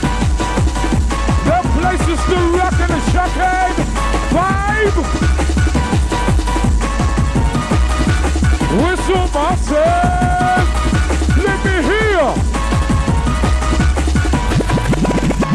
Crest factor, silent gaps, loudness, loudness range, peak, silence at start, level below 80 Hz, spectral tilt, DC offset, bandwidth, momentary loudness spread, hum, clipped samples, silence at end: 12 dB; none; -15 LUFS; 1 LU; -2 dBFS; 0 s; -18 dBFS; -5.5 dB/octave; under 0.1%; 12.5 kHz; 3 LU; none; under 0.1%; 0 s